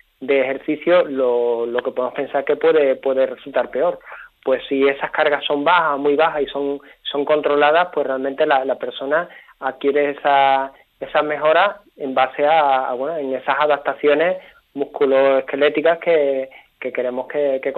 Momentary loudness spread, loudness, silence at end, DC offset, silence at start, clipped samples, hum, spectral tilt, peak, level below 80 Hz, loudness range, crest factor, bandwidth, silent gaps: 11 LU; -18 LUFS; 0 s; under 0.1%; 0.2 s; under 0.1%; none; -6.5 dB/octave; -2 dBFS; -64 dBFS; 2 LU; 16 dB; 4.4 kHz; none